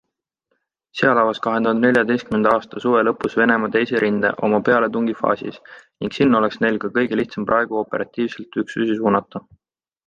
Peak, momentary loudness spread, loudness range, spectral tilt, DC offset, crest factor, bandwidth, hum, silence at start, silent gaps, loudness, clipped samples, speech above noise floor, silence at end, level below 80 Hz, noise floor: -2 dBFS; 9 LU; 3 LU; -7 dB/octave; under 0.1%; 18 dB; 8.6 kHz; none; 0.95 s; none; -19 LUFS; under 0.1%; 54 dB; 0.7 s; -58 dBFS; -73 dBFS